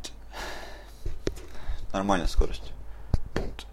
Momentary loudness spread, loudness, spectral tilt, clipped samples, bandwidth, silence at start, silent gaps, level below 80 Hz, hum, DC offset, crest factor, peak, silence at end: 16 LU; -33 LUFS; -5.5 dB/octave; under 0.1%; 13 kHz; 0 s; none; -32 dBFS; none; under 0.1%; 20 dB; -8 dBFS; 0 s